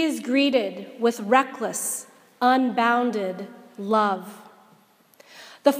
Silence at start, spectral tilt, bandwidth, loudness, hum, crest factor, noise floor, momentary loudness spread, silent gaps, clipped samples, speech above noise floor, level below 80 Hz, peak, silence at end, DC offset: 0 s; -3.5 dB/octave; 15.5 kHz; -23 LUFS; none; 22 dB; -57 dBFS; 15 LU; none; under 0.1%; 35 dB; -80 dBFS; -2 dBFS; 0 s; under 0.1%